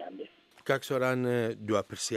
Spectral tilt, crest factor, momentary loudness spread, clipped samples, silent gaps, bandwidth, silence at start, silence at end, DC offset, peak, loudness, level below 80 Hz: -4.5 dB/octave; 20 dB; 16 LU; under 0.1%; none; 15.5 kHz; 0 s; 0 s; under 0.1%; -12 dBFS; -30 LUFS; -76 dBFS